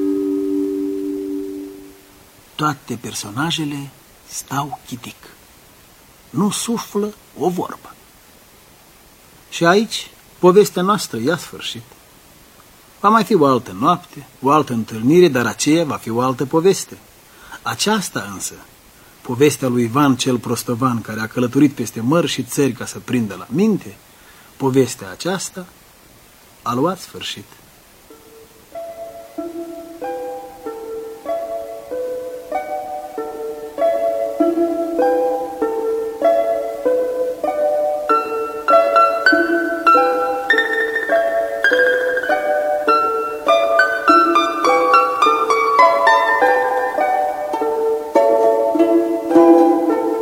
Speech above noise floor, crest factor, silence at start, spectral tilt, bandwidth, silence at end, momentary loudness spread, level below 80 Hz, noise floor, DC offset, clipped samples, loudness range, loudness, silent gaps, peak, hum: 29 dB; 18 dB; 0 s; -4.5 dB/octave; 16.5 kHz; 0 s; 16 LU; -56 dBFS; -47 dBFS; under 0.1%; under 0.1%; 12 LU; -17 LUFS; none; 0 dBFS; none